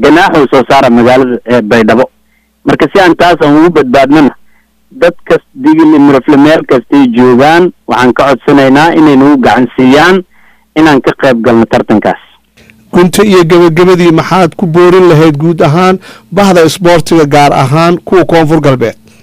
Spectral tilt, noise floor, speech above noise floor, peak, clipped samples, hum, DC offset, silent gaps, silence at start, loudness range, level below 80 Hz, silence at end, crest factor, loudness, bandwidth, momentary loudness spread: -6 dB/octave; -50 dBFS; 46 dB; 0 dBFS; 0.4%; none; under 0.1%; none; 0 s; 2 LU; -36 dBFS; 0.3 s; 6 dB; -5 LUFS; 15.5 kHz; 6 LU